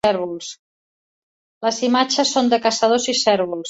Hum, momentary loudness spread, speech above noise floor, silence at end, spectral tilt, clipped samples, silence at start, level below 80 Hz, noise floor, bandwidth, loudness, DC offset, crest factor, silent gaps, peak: none; 10 LU; over 72 dB; 0 s; -2.5 dB/octave; under 0.1%; 0.05 s; -62 dBFS; under -90 dBFS; 8.4 kHz; -18 LUFS; under 0.1%; 18 dB; 0.59-1.61 s; -2 dBFS